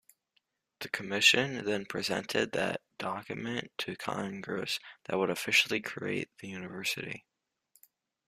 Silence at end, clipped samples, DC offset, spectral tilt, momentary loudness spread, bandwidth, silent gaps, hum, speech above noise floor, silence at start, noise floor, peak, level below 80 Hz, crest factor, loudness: 1.1 s; under 0.1%; under 0.1%; -3 dB/octave; 13 LU; 15.5 kHz; none; none; 44 dB; 0.8 s; -77 dBFS; -8 dBFS; -72 dBFS; 26 dB; -31 LUFS